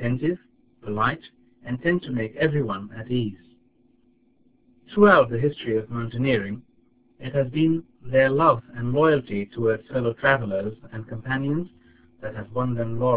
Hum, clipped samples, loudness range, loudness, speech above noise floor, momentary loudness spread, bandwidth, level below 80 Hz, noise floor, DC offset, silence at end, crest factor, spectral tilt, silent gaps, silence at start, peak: none; under 0.1%; 5 LU; -24 LUFS; 39 dB; 17 LU; 4 kHz; -54 dBFS; -62 dBFS; 0.3%; 0 s; 22 dB; -11 dB/octave; none; 0 s; -2 dBFS